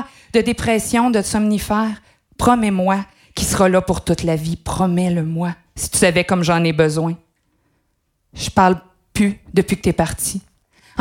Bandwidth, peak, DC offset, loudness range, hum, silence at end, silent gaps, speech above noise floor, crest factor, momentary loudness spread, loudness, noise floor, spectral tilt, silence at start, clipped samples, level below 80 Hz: 17 kHz; 0 dBFS; under 0.1%; 2 LU; none; 0 s; none; 50 dB; 18 dB; 10 LU; -18 LUFS; -67 dBFS; -5 dB/octave; 0 s; under 0.1%; -38 dBFS